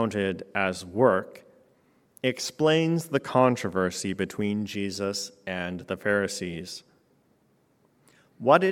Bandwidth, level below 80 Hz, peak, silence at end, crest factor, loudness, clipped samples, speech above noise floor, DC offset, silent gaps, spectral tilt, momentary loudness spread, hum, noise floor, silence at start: 17 kHz; -68 dBFS; -4 dBFS; 0 s; 22 dB; -27 LUFS; under 0.1%; 40 dB; under 0.1%; none; -5 dB/octave; 11 LU; none; -66 dBFS; 0 s